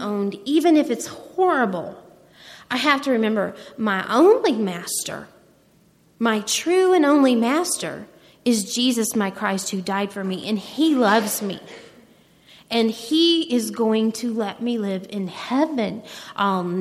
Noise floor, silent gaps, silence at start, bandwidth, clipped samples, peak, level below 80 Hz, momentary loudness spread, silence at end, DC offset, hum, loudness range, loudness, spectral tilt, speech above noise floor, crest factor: -57 dBFS; none; 0 s; 15.5 kHz; under 0.1%; -4 dBFS; -68 dBFS; 12 LU; 0 s; under 0.1%; none; 3 LU; -21 LUFS; -4 dB/octave; 36 dB; 18 dB